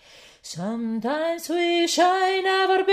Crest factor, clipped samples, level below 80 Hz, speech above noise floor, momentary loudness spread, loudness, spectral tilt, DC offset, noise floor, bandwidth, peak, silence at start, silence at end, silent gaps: 16 dB; under 0.1%; -68 dBFS; 24 dB; 12 LU; -22 LUFS; -3 dB/octave; under 0.1%; -46 dBFS; 15.5 kHz; -8 dBFS; 0.45 s; 0 s; none